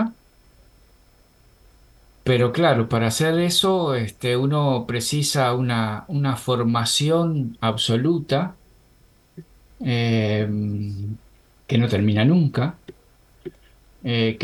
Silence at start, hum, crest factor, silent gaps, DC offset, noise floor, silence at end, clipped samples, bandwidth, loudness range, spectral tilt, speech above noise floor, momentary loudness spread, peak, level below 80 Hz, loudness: 0 s; none; 18 dB; none; under 0.1%; -56 dBFS; 0 s; under 0.1%; 19 kHz; 4 LU; -5.5 dB/octave; 35 dB; 12 LU; -4 dBFS; -54 dBFS; -21 LUFS